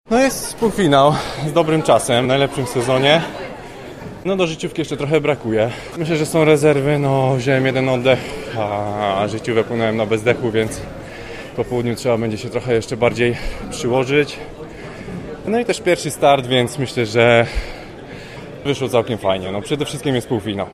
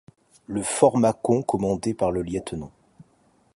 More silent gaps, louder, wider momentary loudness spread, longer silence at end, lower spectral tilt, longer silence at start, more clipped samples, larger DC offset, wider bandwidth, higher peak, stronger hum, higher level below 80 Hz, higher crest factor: neither; first, -18 LUFS vs -23 LUFS; about the same, 17 LU vs 15 LU; second, 0 s vs 0.85 s; about the same, -5.5 dB/octave vs -6 dB/octave; second, 0.1 s vs 0.5 s; neither; neither; first, 15.5 kHz vs 11.5 kHz; first, 0 dBFS vs -4 dBFS; neither; first, -40 dBFS vs -50 dBFS; second, 16 dB vs 22 dB